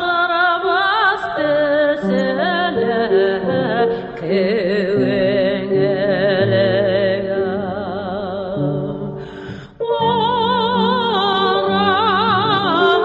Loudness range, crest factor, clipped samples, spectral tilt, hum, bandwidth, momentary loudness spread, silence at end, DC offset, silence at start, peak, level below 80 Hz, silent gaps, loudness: 4 LU; 14 dB; under 0.1%; -7.5 dB/octave; none; 7.8 kHz; 9 LU; 0 s; under 0.1%; 0 s; -2 dBFS; -48 dBFS; none; -17 LUFS